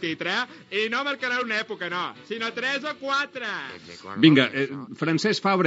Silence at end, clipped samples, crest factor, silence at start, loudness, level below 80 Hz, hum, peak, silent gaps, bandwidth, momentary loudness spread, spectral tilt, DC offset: 0 s; under 0.1%; 22 dB; 0 s; -25 LUFS; -78 dBFS; none; -2 dBFS; none; 7.6 kHz; 12 LU; -3 dB/octave; under 0.1%